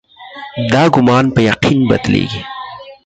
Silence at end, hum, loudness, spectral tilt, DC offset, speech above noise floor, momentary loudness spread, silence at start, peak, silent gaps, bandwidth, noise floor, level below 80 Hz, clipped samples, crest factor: 0.1 s; none; -12 LUFS; -6.5 dB/octave; under 0.1%; 21 dB; 18 LU; 0.2 s; 0 dBFS; none; 9 kHz; -32 dBFS; -40 dBFS; under 0.1%; 14 dB